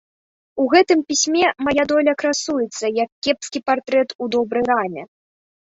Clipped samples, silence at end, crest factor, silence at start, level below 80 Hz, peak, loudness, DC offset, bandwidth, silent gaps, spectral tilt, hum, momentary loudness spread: under 0.1%; 0.6 s; 18 dB; 0.55 s; -58 dBFS; -2 dBFS; -19 LUFS; under 0.1%; 8.2 kHz; 3.12-3.22 s, 4.15-4.19 s; -2.5 dB/octave; none; 7 LU